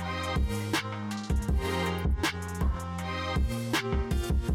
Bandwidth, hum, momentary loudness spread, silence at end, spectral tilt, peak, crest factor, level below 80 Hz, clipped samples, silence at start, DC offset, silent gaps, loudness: 16.5 kHz; none; 4 LU; 0 s; -5.5 dB/octave; -18 dBFS; 12 dB; -32 dBFS; under 0.1%; 0 s; under 0.1%; none; -31 LUFS